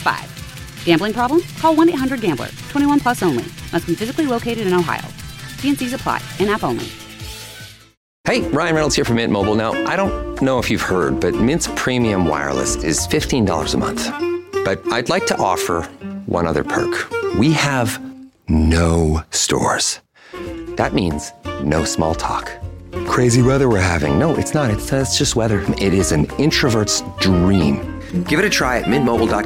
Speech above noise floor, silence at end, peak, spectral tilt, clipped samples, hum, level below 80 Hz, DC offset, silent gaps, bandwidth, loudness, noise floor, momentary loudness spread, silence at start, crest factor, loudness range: 21 dB; 0 s; -2 dBFS; -4.5 dB/octave; under 0.1%; none; -34 dBFS; under 0.1%; 7.97-8.24 s; 16.5 kHz; -18 LUFS; -38 dBFS; 12 LU; 0 s; 16 dB; 4 LU